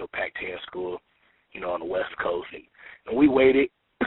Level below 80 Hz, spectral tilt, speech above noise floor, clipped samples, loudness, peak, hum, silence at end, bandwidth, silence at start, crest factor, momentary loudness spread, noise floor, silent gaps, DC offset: -56 dBFS; -3.5 dB/octave; 42 dB; under 0.1%; -25 LUFS; -6 dBFS; none; 0 s; 4.1 kHz; 0 s; 20 dB; 22 LU; -65 dBFS; none; under 0.1%